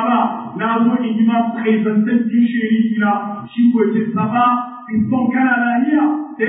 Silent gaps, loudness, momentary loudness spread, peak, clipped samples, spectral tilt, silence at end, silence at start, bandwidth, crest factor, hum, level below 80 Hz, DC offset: none; -16 LUFS; 6 LU; -4 dBFS; under 0.1%; -12 dB/octave; 0 s; 0 s; 3.9 kHz; 12 dB; none; -58 dBFS; under 0.1%